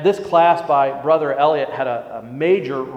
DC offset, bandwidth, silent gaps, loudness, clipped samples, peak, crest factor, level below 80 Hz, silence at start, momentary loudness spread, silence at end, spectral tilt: under 0.1%; 8.8 kHz; none; -17 LUFS; under 0.1%; 0 dBFS; 16 dB; -62 dBFS; 0 s; 9 LU; 0 s; -6.5 dB/octave